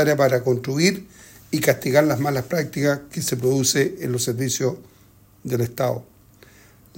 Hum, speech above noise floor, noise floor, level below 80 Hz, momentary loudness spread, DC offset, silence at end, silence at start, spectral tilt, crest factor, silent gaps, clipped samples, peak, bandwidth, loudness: none; 31 dB; -52 dBFS; -58 dBFS; 9 LU; under 0.1%; 0.95 s; 0 s; -4.5 dB/octave; 20 dB; none; under 0.1%; -2 dBFS; 16.5 kHz; -21 LUFS